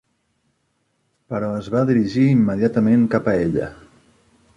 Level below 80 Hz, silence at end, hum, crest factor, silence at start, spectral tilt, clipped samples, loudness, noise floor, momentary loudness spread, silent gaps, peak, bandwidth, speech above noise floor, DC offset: -50 dBFS; 0.85 s; none; 16 dB; 1.3 s; -9 dB/octave; under 0.1%; -19 LUFS; -69 dBFS; 10 LU; none; -4 dBFS; 7.4 kHz; 51 dB; under 0.1%